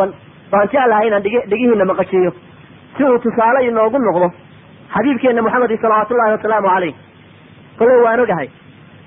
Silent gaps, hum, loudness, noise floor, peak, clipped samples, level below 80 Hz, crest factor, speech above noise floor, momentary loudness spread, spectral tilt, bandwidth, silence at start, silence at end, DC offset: none; none; -14 LUFS; -42 dBFS; -2 dBFS; under 0.1%; -54 dBFS; 12 dB; 28 dB; 6 LU; -11.5 dB/octave; 3.7 kHz; 0 s; 0.6 s; under 0.1%